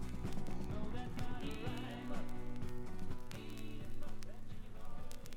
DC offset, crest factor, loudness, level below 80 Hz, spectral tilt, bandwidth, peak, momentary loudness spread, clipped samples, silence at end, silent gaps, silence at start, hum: under 0.1%; 14 dB; -48 LUFS; -46 dBFS; -6 dB/octave; 10.5 kHz; -24 dBFS; 9 LU; under 0.1%; 0 s; none; 0 s; none